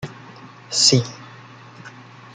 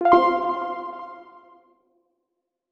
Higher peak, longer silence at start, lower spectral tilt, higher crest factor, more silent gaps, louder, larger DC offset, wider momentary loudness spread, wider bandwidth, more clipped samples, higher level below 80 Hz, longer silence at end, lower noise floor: about the same, -2 dBFS vs -2 dBFS; about the same, 0 s vs 0 s; second, -3 dB/octave vs -6.5 dB/octave; about the same, 22 dB vs 22 dB; neither; first, -16 LUFS vs -22 LUFS; neither; first, 26 LU vs 23 LU; first, 9.6 kHz vs 6.6 kHz; neither; about the same, -60 dBFS vs -62 dBFS; second, 0.45 s vs 1.5 s; second, -42 dBFS vs -80 dBFS